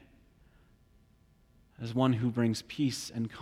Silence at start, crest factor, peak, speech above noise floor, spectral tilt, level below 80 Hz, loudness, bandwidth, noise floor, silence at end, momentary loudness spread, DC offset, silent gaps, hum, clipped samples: 1.8 s; 20 dB; -14 dBFS; 34 dB; -6 dB/octave; -64 dBFS; -32 LUFS; 15.5 kHz; -64 dBFS; 0 s; 9 LU; under 0.1%; none; none; under 0.1%